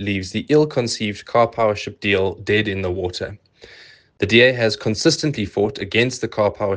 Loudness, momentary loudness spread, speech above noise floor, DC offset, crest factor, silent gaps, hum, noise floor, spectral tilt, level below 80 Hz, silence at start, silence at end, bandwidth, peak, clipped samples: -19 LUFS; 9 LU; 27 dB; under 0.1%; 18 dB; none; none; -46 dBFS; -4.5 dB/octave; -54 dBFS; 0 s; 0 s; 10 kHz; 0 dBFS; under 0.1%